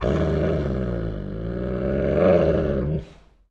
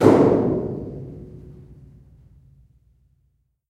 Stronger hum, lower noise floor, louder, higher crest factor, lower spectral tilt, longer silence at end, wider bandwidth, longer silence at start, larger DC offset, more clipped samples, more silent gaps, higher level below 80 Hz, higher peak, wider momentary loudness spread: neither; second, -45 dBFS vs -67 dBFS; second, -23 LUFS vs -20 LUFS; second, 16 dB vs 22 dB; about the same, -9 dB/octave vs -8.5 dB/octave; second, 0.35 s vs 2.3 s; second, 7.6 kHz vs 13 kHz; about the same, 0 s vs 0 s; neither; neither; neither; first, -32 dBFS vs -48 dBFS; second, -6 dBFS vs 0 dBFS; second, 12 LU vs 28 LU